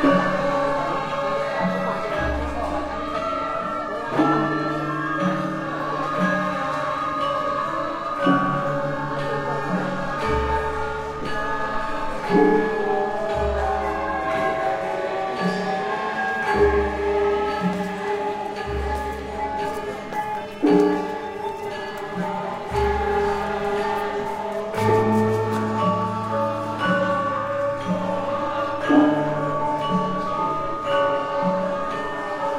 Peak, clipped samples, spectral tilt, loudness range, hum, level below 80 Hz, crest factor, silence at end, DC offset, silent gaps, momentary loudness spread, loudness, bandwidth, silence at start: -4 dBFS; under 0.1%; -6.5 dB/octave; 3 LU; none; -40 dBFS; 18 dB; 0 s; under 0.1%; none; 8 LU; -23 LUFS; 15.5 kHz; 0 s